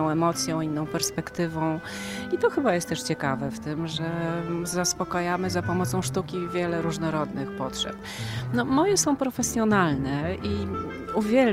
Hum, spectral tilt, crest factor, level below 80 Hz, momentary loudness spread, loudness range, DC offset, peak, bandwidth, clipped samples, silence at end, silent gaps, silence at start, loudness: none; -4.5 dB/octave; 18 dB; -50 dBFS; 9 LU; 3 LU; under 0.1%; -8 dBFS; 16 kHz; under 0.1%; 0 s; none; 0 s; -27 LUFS